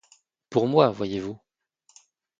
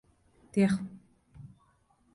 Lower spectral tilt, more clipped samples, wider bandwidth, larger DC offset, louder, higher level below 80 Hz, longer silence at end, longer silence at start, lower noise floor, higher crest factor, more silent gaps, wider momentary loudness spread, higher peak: about the same, -7 dB/octave vs -7.5 dB/octave; neither; second, 7.8 kHz vs 11.5 kHz; neither; first, -24 LUFS vs -30 LUFS; about the same, -62 dBFS vs -64 dBFS; first, 1.05 s vs 0.7 s; about the same, 0.5 s vs 0.55 s; about the same, -66 dBFS vs -68 dBFS; first, 24 dB vs 18 dB; neither; second, 16 LU vs 25 LU; first, -4 dBFS vs -16 dBFS